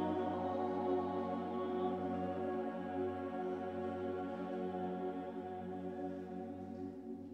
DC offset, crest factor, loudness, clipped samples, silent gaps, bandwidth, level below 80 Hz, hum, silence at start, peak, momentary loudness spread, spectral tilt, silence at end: under 0.1%; 16 dB; -41 LUFS; under 0.1%; none; 7.8 kHz; -78 dBFS; none; 0 s; -26 dBFS; 8 LU; -8.5 dB/octave; 0 s